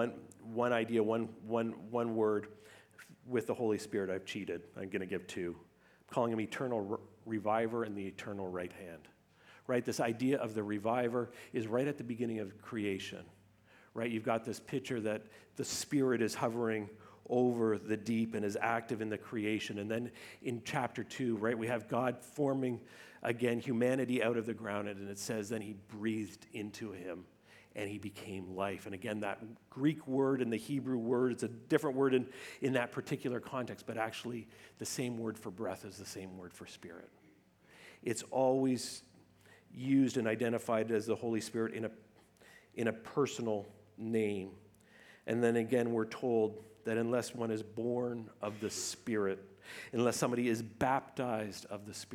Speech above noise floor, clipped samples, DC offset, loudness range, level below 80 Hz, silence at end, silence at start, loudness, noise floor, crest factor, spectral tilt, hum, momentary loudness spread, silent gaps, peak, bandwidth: 30 dB; under 0.1%; under 0.1%; 6 LU; -78 dBFS; 0 s; 0 s; -37 LUFS; -66 dBFS; 22 dB; -5.5 dB/octave; none; 13 LU; none; -16 dBFS; 17 kHz